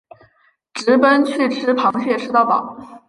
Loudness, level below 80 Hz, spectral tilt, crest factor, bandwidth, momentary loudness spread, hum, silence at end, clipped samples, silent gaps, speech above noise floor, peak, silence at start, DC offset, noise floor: -16 LUFS; -66 dBFS; -4.5 dB/octave; 16 dB; 11.5 kHz; 10 LU; none; 0.1 s; under 0.1%; none; 43 dB; -2 dBFS; 0.75 s; under 0.1%; -59 dBFS